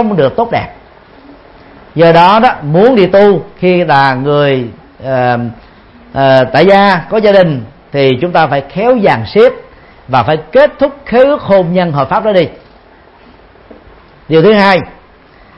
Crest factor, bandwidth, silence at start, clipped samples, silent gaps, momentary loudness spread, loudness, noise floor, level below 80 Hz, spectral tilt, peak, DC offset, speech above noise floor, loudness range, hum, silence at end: 10 dB; 8 kHz; 0 s; 0.5%; none; 11 LU; -9 LUFS; -40 dBFS; -42 dBFS; -8 dB/octave; 0 dBFS; under 0.1%; 32 dB; 4 LU; none; 0.65 s